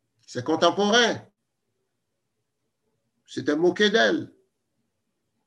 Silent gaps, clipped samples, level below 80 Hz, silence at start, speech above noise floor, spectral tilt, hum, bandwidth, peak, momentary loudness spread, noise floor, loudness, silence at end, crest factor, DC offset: none; under 0.1%; -76 dBFS; 0.3 s; 58 dB; -3.5 dB/octave; none; 11 kHz; -6 dBFS; 17 LU; -80 dBFS; -22 LUFS; 1.2 s; 20 dB; under 0.1%